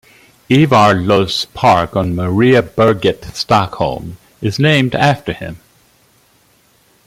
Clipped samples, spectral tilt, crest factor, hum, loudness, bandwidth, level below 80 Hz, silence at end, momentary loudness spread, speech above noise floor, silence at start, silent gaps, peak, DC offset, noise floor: under 0.1%; -6 dB/octave; 14 dB; none; -13 LUFS; 16 kHz; -44 dBFS; 1.5 s; 12 LU; 40 dB; 0.5 s; none; 0 dBFS; under 0.1%; -53 dBFS